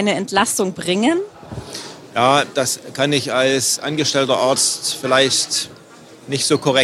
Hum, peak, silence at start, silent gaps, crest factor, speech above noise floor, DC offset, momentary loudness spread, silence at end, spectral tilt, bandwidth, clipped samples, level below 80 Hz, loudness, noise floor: none; 0 dBFS; 0 s; none; 18 dB; 24 dB; under 0.1%; 14 LU; 0 s; -2.5 dB/octave; 16 kHz; under 0.1%; -56 dBFS; -17 LUFS; -42 dBFS